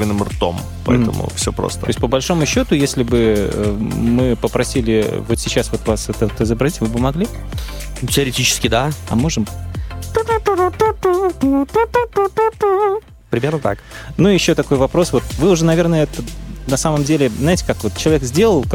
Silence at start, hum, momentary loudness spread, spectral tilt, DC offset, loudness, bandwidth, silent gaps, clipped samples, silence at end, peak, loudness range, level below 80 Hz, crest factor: 0 s; none; 8 LU; -5 dB/octave; under 0.1%; -17 LUFS; 17 kHz; none; under 0.1%; 0 s; -2 dBFS; 2 LU; -30 dBFS; 14 dB